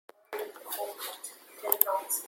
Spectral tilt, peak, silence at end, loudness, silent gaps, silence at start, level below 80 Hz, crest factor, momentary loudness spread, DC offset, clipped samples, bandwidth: 1.5 dB/octave; 0 dBFS; 0 s; -31 LUFS; none; 0.3 s; -88 dBFS; 34 dB; 17 LU; under 0.1%; under 0.1%; 17 kHz